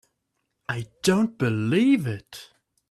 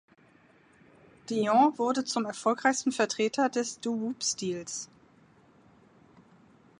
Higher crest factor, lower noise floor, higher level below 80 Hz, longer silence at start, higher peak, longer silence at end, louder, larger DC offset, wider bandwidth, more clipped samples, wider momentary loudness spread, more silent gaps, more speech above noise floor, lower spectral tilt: about the same, 18 dB vs 22 dB; first, -77 dBFS vs -61 dBFS; first, -62 dBFS vs -76 dBFS; second, 0.7 s vs 1.3 s; about the same, -8 dBFS vs -10 dBFS; second, 0.45 s vs 1.95 s; first, -24 LUFS vs -28 LUFS; neither; first, 14 kHz vs 11.5 kHz; neither; first, 20 LU vs 12 LU; neither; first, 54 dB vs 33 dB; first, -6 dB/octave vs -3 dB/octave